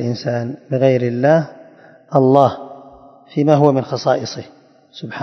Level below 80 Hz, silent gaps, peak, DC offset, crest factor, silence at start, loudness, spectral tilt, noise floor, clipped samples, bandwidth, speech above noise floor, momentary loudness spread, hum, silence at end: -62 dBFS; none; 0 dBFS; under 0.1%; 18 dB; 0 s; -16 LUFS; -7.5 dB/octave; -44 dBFS; under 0.1%; 6.4 kHz; 28 dB; 18 LU; none; 0 s